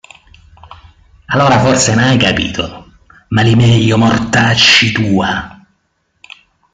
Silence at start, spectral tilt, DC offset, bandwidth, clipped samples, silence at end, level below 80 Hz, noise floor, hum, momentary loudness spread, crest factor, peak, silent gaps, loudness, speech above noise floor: 1.3 s; -4.5 dB/octave; under 0.1%; 9.4 kHz; under 0.1%; 1.25 s; -40 dBFS; -63 dBFS; none; 12 LU; 12 dB; 0 dBFS; none; -10 LUFS; 52 dB